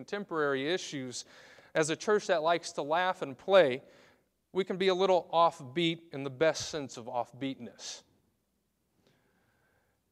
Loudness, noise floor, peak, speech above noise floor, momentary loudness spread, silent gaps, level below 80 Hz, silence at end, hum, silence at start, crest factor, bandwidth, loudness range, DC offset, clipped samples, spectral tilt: -31 LUFS; -78 dBFS; -10 dBFS; 47 dB; 15 LU; none; -74 dBFS; 2.1 s; none; 0 s; 22 dB; 13 kHz; 8 LU; under 0.1%; under 0.1%; -4 dB/octave